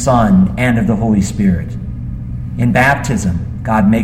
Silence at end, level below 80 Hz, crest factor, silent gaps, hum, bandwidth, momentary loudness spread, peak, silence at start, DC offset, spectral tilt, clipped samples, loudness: 0 s; -28 dBFS; 14 dB; none; none; 13 kHz; 13 LU; 0 dBFS; 0 s; under 0.1%; -7 dB/octave; under 0.1%; -14 LUFS